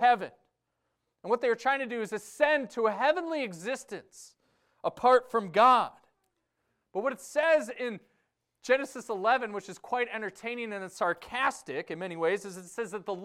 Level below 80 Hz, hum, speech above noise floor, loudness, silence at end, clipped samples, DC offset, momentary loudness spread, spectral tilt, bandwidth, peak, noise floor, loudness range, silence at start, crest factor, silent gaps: -74 dBFS; none; 52 dB; -29 LUFS; 0 s; under 0.1%; under 0.1%; 14 LU; -4 dB/octave; 15 kHz; -10 dBFS; -81 dBFS; 5 LU; 0 s; 20 dB; none